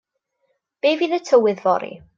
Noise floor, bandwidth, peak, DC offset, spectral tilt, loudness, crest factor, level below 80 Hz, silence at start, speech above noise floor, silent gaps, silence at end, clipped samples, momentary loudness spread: -71 dBFS; 7.6 kHz; -4 dBFS; under 0.1%; -5 dB/octave; -19 LUFS; 16 dB; -68 dBFS; 0.85 s; 52 dB; none; 0.2 s; under 0.1%; 6 LU